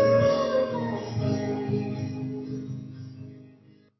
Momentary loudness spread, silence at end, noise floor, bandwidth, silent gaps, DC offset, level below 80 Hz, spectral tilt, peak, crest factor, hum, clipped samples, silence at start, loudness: 19 LU; 0.5 s; -55 dBFS; 6 kHz; none; under 0.1%; -54 dBFS; -7.5 dB/octave; -12 dBFS; 16 dB; none; under 0.1%; 0 s; -28 LUFS